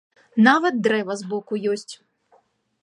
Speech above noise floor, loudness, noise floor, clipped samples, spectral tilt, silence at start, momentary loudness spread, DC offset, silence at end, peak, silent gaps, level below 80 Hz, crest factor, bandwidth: 41 dB; -21 LUFS; -61 dBFS; under 0.1%; -5 dB/octave; 0.35 s; 13 LU; under 0.1%; 0.9 s; -2 dBFS; none; -74 dBFS; 20 dB; 11 kHz